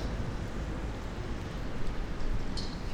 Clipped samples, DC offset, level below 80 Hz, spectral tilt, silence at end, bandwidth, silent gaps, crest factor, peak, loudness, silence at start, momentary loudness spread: under 0.1%; under 0.1%; -36 dBFS; -6 dB/octave; 0 s; 10 kHz; none; 14 dB; -20 dBFS; -38 LUFS; 0 s; 2 LU